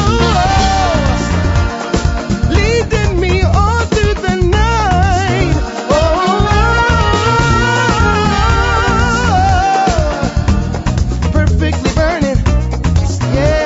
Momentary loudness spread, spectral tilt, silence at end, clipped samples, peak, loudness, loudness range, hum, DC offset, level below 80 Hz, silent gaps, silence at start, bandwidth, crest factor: 4 LU; -5.5 dB/octave; 0 s; under 0.1%; 0 dBFS; -13 LUFS; 2 LU; none; under 0.1%; -18 dBFS; none; 0 s; 8 kHz; 12 dB